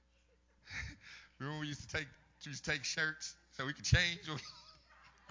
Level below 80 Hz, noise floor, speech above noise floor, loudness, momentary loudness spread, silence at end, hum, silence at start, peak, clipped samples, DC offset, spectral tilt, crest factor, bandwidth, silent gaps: -52 dBFS; -72 dBFS; 33 dB; -38 LUFS; 20 LU; 0 s; none; 0.65 s; -16 dBFS; under 0.1%; under 0.1%; -3.5 dB/octave; 26 dB; 7.6 kHz; none